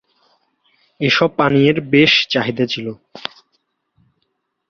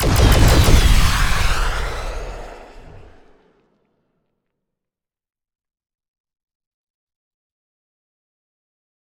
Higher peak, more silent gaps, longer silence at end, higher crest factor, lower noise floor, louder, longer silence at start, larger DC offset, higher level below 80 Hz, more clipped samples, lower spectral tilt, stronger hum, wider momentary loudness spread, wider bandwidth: about the same, -2 dBFS vs 0 dBFS; neither; second, 1.45 s vs 6.6 s; about the same, 18 dB vs 20 dB; second, -71 dBFS vs -85 dBFS; about the same, -15 LUFS vs -16 LUFS; first, 1 s vs 0 s; neither; second, -56 dBFS vs -22 dBFS; neither; about the same, -5.5 dB/octave vs -4.5 dB/octave; neither; about the same, 19 LU vs 20 LU; second, 7 kHz vs 19.5 kHz